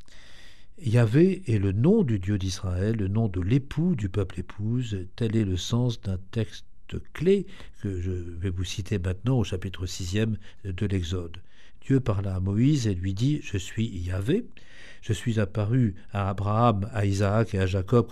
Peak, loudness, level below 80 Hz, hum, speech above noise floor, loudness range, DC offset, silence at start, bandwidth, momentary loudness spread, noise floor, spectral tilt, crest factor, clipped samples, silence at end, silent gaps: -8 dBFS; -27 LUFS; -46 dBFS; none; 21 dB; 5 LU; 1%; 0.1 s; 12.5 kHz; 11 LU; -47 dBFS; -7 dB/octave; 18 dB; under 0.1%; 0 s; none